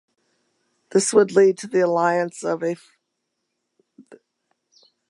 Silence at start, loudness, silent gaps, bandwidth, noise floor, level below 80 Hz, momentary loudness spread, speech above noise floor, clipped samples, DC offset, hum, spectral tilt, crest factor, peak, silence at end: 0.95 s; -20 LUFS; none; 11.5 kHz; -77 dBFS; -80 dBFS; 9 LU; 58 dB; under 0.1%; under 0.1%; none; -4.5 dB/octave; 20 dB; -4 dBFS; 0.95 s